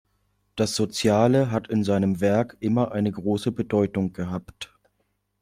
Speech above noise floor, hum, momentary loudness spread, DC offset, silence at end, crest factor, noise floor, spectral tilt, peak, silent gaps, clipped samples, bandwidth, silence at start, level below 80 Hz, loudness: 50 dB; 50 Hz at -45 dBFS; 13 LU; under 0.1%; 0.75 s; 18 dB; -73 dBFS; -6 dB/octave; -6 dBFS; none; under 0.1%; 15.5 kHz; 0.55 s; -58 dBFS; -24 LUFS